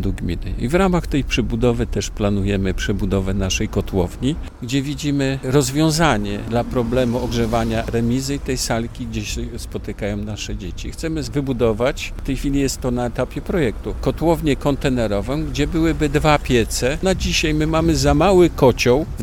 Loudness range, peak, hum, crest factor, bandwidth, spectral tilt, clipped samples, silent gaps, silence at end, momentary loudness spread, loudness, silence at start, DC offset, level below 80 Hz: 6 LU; -2 dBFS; none; 18 dB; 18.5 kHz; -5.5 dB/octave; under 0.1%; none; 0 s; 10 LU; -20 LUFS; 0 s; under 0.1%; -28 dBFS